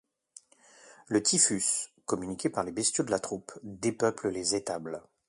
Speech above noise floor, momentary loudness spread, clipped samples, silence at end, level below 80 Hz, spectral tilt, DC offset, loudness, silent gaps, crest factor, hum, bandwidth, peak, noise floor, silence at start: 28 dB; 14 LU; under 0.1%; 0.3 s; -66 dBFS; -3 dB/octave; under 0.1%; -29 LUFS; none; 22 dB; none; 11.5 kHz; -10 dBFS; -58 dBFS; 0.85 s